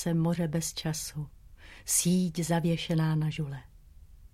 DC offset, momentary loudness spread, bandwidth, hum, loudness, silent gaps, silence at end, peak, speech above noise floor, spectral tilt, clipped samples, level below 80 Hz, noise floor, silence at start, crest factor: under 0.1%; 15 LU; 16 kHz; none; -29 LUFS; none; 0.05 s; -12 dBFS; 23 dB; -5 dB/octave; under 0.1%; -54 dBFS; -52 dBFS; 0 s; 18 dB